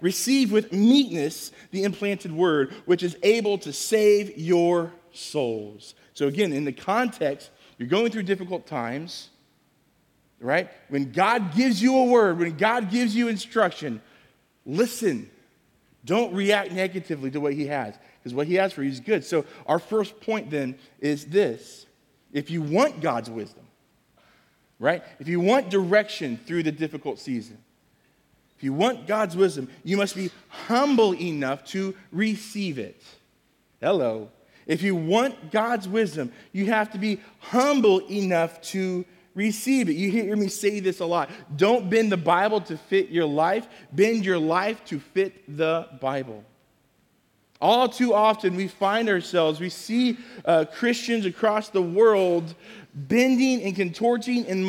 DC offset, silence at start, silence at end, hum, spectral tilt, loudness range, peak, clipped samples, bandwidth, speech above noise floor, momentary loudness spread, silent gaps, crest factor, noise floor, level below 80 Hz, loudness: under 0.1%; 0 s; 0 s; none; -5 dB/octave; 5 LU; -6 dBFS; under 0.1%; 17 kHz; 42 dB; 13 LU; none; 18 dB; -65 dBFS; -72 dBFS; -24 LUFS